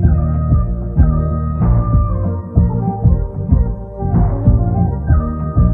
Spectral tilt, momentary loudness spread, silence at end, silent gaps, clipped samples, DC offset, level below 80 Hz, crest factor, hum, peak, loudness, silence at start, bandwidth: -14.5 dB/octave; 4 LU; 0 s; none; under 0.1%; under 0.1%; -18 dBFS; 14 dB; none; 0 dBFS; -16 LUFS; 0 s; 2.1 kHz